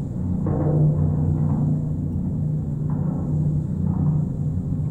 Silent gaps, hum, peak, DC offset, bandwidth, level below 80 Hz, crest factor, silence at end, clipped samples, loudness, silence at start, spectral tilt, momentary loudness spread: none; none; -10 dBFS; under 0.1%; 1.9 kHz; -38 dBFS; 12 dB; 0 s; under 0.1%; -23 LUFS; 0 s; -12 dB/octave; 6 LU